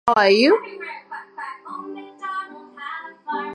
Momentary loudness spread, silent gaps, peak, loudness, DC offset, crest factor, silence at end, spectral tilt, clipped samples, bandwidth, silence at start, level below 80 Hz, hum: 21 LU; none; -2 dBFS; -19 LUFS; under 0.1%; 20 dB; 0 s; -4.5 dB/octave; under 0.1%; 11 kHz; 0.05 s; -68 dBFS; none